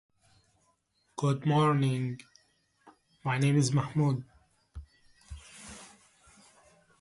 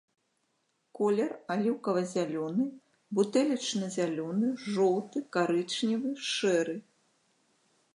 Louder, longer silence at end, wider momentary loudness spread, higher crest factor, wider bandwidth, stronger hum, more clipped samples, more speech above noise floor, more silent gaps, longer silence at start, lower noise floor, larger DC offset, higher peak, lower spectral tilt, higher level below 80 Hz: about the same, -29 LUFS vs -30 LUFS; about the same, 1.15 s vs 1.15 s; first, 25 LU vs 5 LU; about the same, 18 dB vs 18 dB; about the same, 11.5 kHz vs 11.5 kHz; neither; neither; about the same, 46 dB vs 47 dB; neither; first, 1.2 s vs 0.95 s; second, -73 dBFS vs -77 dBFS; neither; about the same, -14 dBFS vs -14 dBFS; first, -6.5 dB/octave vs -5 dB/octave; first, -58 dBFS vs -84 dBFS